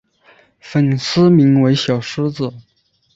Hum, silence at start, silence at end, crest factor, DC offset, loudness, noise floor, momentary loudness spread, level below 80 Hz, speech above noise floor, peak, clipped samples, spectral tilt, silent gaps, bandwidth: none; 0.65 s; 0.55 s; 14 dB; under 0.1%; -15 LUFS; -51 dBFS; 11 LU; -54 dBFS; 37 dB; -2 dBFS; under 0.1%; -7 dB/octave; none; 7.8 kHz